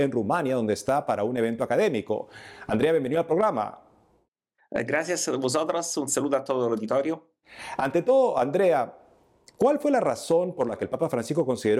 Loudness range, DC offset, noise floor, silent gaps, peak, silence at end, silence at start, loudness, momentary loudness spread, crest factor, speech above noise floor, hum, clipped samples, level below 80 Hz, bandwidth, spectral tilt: 3 LU; under 0.1%; -70 dBFS; 4.28-4.32 s; -12 dBFS; 0 s; 0 s; -25 LUFS; 9 LU; 14 dB; 45 dB; none; under 0.1%; -66 dBFS; 15 kHz; -5 dB/octave